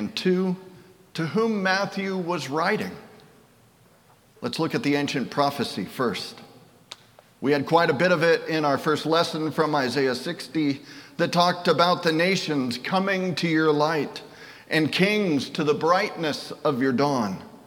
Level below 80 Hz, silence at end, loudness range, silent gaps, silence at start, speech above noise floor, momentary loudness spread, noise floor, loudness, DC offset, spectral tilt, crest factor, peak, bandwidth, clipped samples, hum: -70 dBFS; 0.1 s; 5 LU; none; 0 s; 33 dB; 12 LU; -57 dBFS; -24 LUFS; under 0.1%; -5.5 dB/octave; 20 dB; -4 dBFS; 18 kHz; under 0.1%; none